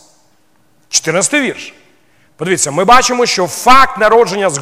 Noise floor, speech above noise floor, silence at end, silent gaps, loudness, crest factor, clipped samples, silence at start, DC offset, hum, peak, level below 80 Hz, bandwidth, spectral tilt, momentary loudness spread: -55 dBFS; 45 dB; 0 s; none; -10 LUFS; 12 dB; 0.6%; 0 s; under 0.1%; none; 0 dBFS; -40 dBFS; 16.5 kHz; -2.5 dB/octave; 12 LU